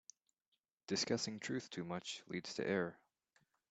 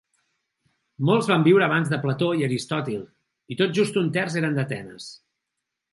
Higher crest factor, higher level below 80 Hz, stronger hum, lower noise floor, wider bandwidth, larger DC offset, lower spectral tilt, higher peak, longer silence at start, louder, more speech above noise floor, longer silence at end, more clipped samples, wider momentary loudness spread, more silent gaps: about the same, 20 dB vs 18 dB; second, -82 dBFS vs -68 dBFS; neither; about the same, -79 dBFS vs -82 dBFS; second, 9 kHz vs 11.5 kHz; neither; second, -4 dB/octave vs -6 dB/octave; second, -24 dBFS vs -6 dBFS; about the same, 0.9 s vs 1 s; second, -42 LUFS vs -23 LUFS; second, 37 dB vs 60 dB; about the same, 0.75 s vs 0.75 s; neither; second, 7 LU vs 16 LU; neither